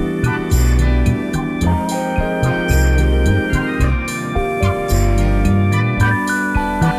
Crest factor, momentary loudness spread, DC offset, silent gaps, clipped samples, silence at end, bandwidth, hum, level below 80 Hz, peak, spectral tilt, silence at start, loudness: 10 dB; 4 LU; under 0.1%; none; under 0.1%; 0 s; 14.5 kHz; none; -20 dBFS; -4 dBFS; -6.5 dB/octave; 0 s; -17 LUFS